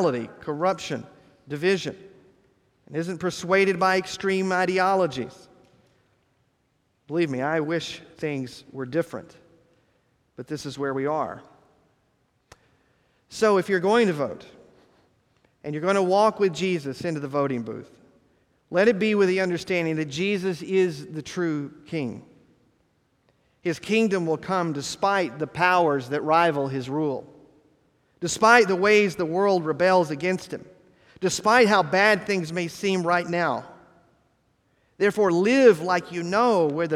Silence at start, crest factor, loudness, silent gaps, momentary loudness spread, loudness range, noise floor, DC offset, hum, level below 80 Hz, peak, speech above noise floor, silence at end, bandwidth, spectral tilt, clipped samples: 0 s; 24 dB; -23 LUFS; none; 15 LU; 9 LU; -69 dBFS; under 0.1%; none; -66 dBFS; -2 dBFS; 46 dB; 0 s; 14 kHz; -5 dB/octave; under 0.1%